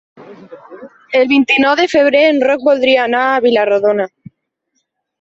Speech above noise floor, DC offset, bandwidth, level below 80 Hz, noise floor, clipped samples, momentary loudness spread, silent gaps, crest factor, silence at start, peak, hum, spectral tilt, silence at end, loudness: 56 dB; under 0.1%; 7.8 kHz; -58 dBFS; -68 dBFS; under 0.1%; 5 LU; none; 14 dB; 0.2 s; 0 dBFS; none; -4.5 dB/octave; 1.15 s; -12 LUFS